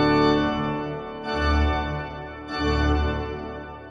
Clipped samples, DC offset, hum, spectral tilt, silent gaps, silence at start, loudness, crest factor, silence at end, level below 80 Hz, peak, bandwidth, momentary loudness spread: under 0.1%; under 0.1%; none; -7 dB/octave; none; 0 s; -25 LUFS; 16 dB; 0 s; -30 dBFS; -8 dBFS; 7.6 kHz; 13 LU